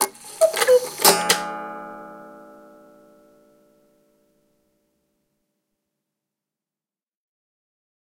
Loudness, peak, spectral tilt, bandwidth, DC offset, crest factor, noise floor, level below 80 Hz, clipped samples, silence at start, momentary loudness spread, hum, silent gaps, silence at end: -18 LUFS; 0 dBFS; -1 dB/octave; 16 kHz; under 0.1%; 26 dB; under -90 dBFS; -70 dBFS; under 0.1%; 0 s; 24 LU; none; none; 5.65 s